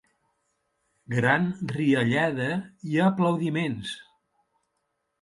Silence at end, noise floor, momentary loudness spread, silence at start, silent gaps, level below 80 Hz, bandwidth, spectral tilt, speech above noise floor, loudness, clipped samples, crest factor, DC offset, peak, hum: 1.2 s; -78 dBFS; 10 LU; 1.1 s; none; -64 dBFS; 11.5 kHz; -7 dB/octave; 53 dB; -25 LUFS; under 0.1%; 20 dB; under 0.1%; -6 dBFS; none